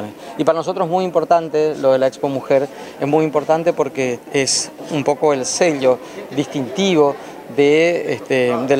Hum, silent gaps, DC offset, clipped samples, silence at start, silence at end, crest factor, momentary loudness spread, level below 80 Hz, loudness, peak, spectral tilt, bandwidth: none; none; under 0.1%; under 0.1%; 0 s; 0 s; 16 dB; 8 LU; -62 dBFS; -17 LUFS; 0 dBFS; -4 dB/octave; 16 kHz